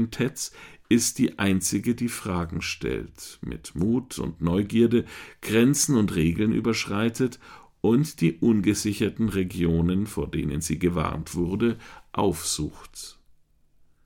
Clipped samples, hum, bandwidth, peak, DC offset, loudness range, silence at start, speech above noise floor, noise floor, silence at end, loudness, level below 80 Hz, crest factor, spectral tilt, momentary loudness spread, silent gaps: under 0.1%; none; 18 kHz; -8 dBFS; under 0.1%; 4 LU; 0 s; 34 dB; -59 dBFS; 0.95 s; -25 LUFS; -46 dBFS; 18 dB; -5 dB/octave; 13 LU; none